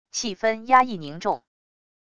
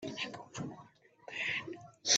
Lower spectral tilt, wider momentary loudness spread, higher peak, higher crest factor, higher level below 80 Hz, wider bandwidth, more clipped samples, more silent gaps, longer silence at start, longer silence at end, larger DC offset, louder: first, -3 dB/octave vs -1 dB/octave; second, 10 LU vs 15 LU; first, -4 dBFS vs -14 dBFS; about the same, 20 dB vs 24 dB; first, -62 dBFS vs -78 dBFS; first, 10 kHz vs 9 kHz; neither; neither; about the same, 0.1 s vs 0 s; first, 0.8 s vs 0 s; neither; first, -23 LUFS vs -40 LUFS